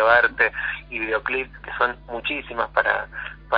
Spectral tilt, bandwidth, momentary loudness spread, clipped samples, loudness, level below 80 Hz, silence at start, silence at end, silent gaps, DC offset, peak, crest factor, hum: -6.5 dB/octave; 5.2 kHz; 11 LU; under 0.1%; -23 LUFS; -46 dBFS; 0 s; 0 s; none; under 0.1%; -4 dBFS; 20 dB; none